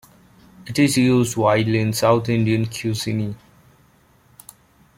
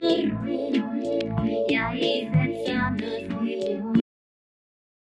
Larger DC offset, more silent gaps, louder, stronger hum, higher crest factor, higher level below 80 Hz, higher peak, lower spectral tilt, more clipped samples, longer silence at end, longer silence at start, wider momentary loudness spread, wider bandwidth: neither; neither; first, -19 LUFS vs -26 LUFS; neither; about the same, 18 dB vs 18 dB; about the same, -54 dBFS vs -52 dBFS; first, -4 dBFS vs -8 dBFS; second, -5.5 dB/octave vs -7 dB/octave; neither; first, 1.6 s vs 1.05 s; first, 0.65 s vs 0 s; first, 10 LU vs 5 LU; first, 16.5 kHz vs 10 kHz